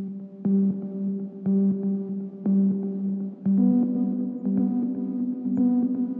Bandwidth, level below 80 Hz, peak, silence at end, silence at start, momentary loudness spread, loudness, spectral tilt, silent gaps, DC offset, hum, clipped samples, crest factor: 1.7 kHz; -72 dBFS; -12 dBFS; 0 s; 0 s; 8 LU; -25 LUFS; -14 dB/octave; none; under 0.1%; none; under 0.1%; 12 dB